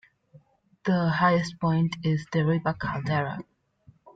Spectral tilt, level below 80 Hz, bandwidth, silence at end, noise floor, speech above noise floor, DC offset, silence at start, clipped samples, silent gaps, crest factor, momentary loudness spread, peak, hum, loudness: -7.5 dB/octave; -58 dBFS; 7.8 kHz; 0.75 s; -59 dBFS; 34 dB; under 0.1%; 0.85 s; under 0.1%; none; 16 dB; 9 LU; -10 dBFS; none; -26 LUFS